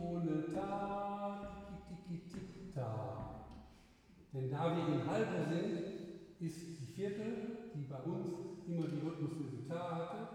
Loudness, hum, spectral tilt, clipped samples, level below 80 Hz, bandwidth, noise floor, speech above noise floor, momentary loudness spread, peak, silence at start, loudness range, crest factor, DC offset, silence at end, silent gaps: -42 LUFS; none; -7.5 dB/octave; under 0.1%; -66 dBFS; 12.5 kHz; -64 dBFS; 24 dB; 13 LU; -24 dBFS; 0 s; 6 LU; 18 dB; under 0.1%; 0 s; none